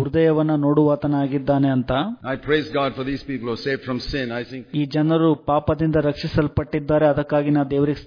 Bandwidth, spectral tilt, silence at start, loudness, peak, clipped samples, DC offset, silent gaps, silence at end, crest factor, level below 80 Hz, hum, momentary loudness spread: 5.2 kHz; -8.5 dB/octave; 0 s; -21 LUFS; -6 dBFS; under 0.1%; under 0.1%; none; 0 s; 14 dB; -42 dBFS; none; 8 LU